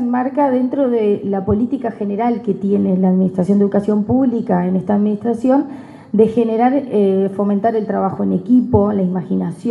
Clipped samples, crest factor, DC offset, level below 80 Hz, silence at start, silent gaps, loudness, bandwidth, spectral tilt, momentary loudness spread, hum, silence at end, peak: under 0.1%; 16 dB; under 0.1%; -46 dBFS; 0 s; none; -16 LUFS; 4.7 kHz; -10 dB/octave; 5 LU; none; 0 s; 0 dBFS